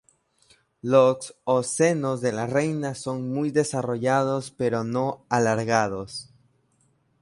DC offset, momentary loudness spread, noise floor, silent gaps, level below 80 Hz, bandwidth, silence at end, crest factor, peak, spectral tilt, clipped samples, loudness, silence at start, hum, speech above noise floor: under 0.1%; 9 LU; -66 dBFS; none; -62 dBFS; 11.5 kHz; 1 s; 20 dB; -6 dBFS; -5.5 dB/octave; under 0.1%; -24 LUFS; 0.85 s; none; 43 dB